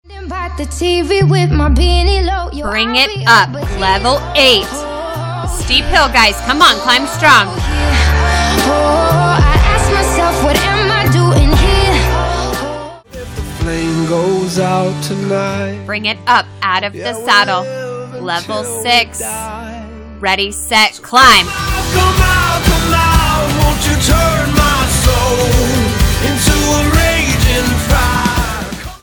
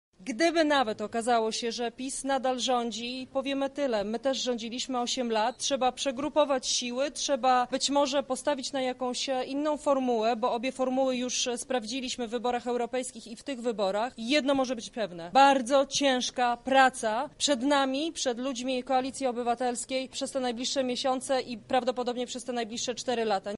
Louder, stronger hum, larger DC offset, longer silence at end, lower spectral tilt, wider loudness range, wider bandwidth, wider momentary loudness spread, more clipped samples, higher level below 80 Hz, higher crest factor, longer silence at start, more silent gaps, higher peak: first, -12 LUFS vs -28 LUFS; neither; neither; about the same, 0.05 s vs 0 s; first, -4 dB/octave vs -2 dB/octave; about the same, 5 LU vs 5 LU; first, over 20 kHz vs 11.5 kHz; first, 12 LU vs 8 LU; first, 0.1% vs under 0.1%; first, -18 dBFS vs -64 dBFS; second, 12 dB vs 20 dB; about the same, 0.1 s vs 0.2 s; neither; first, 0 dBFS vs -10 dBFS